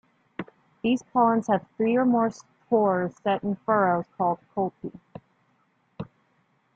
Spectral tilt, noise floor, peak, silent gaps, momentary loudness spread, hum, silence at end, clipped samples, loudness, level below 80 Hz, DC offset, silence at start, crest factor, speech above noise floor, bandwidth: -7 dB/octave; -68 dBFS; -8 dBFS; none; 20 LU; none; 0.7 s; under 0.1%; -25 LUFS; -68 dBFS; under 0.1%; 0.4 s; 18 dB; 44 dB; 7.6 kHz